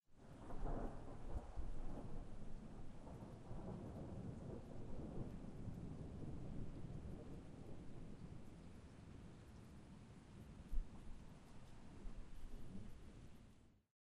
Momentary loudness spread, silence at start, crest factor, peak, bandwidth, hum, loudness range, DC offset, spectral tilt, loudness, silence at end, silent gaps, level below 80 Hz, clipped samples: 9 LU; 0.1 s; 20 dB; -28 dBFS; 11 kHz; none; 6 LU; under 0.1%; -7.5 dB/octave; -56 LUFS; 0.3 s; none; -54 dBFS; under 0.1%